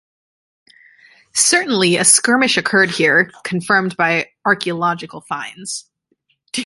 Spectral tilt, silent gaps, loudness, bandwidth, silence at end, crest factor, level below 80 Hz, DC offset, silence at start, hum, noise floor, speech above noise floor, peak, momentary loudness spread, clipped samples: -2 dB/octave; none; -15 LUFS; 12 kHz; 0 s; 18 dB; -64 dBFS; under 0.1%; 1.35 s; none; -65 dBFS; 49 dB; 0 dBFS; 16 LU; under 0.1%